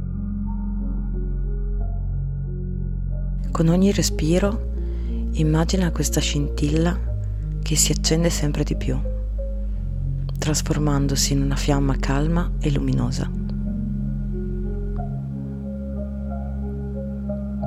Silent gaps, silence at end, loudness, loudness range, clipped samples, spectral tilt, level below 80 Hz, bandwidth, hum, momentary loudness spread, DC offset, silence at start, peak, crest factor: none; 0 s; -24 LUFS; 7 LU; under 0.1%; -5 dB/octave; -26 dBFS; 15 kHz; none; 9 LU; 0.1%; 0 s; -4 dBFS; 18 dB